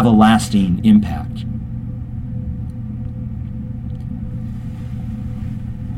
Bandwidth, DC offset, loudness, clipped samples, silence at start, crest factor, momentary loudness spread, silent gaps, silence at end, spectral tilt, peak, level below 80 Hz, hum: 12.5 kHz; under 0.1%; -20 LUFS; under 0.1%; 0 s; 18 dB; 15 LU; none; 0 s; -7 dB/octave; 0 dBFS; -32 dBFS; none